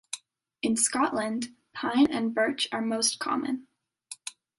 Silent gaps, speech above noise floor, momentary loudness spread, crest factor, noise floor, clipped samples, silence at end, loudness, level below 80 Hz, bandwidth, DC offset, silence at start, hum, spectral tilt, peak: none; 22 dB; 16 LU; 20 dB; -49 dBFS; under 0.1%; 0.3 s; -27 LUFS; -70 dBFS; 12 kHz; under 0.1%; 0.15 s; none; -2 dB/octave; -10 dBFS